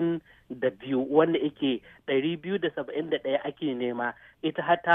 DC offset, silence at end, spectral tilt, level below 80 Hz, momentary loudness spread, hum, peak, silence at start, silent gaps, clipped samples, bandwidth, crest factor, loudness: under 0.1%; 0 s; -8.5 dB/octave; -68 dBFS; 10 LU; none; -6 dBFS; 0 s; none; under 0.1%; 3.9 kHz; 20 dB; -29 LUFS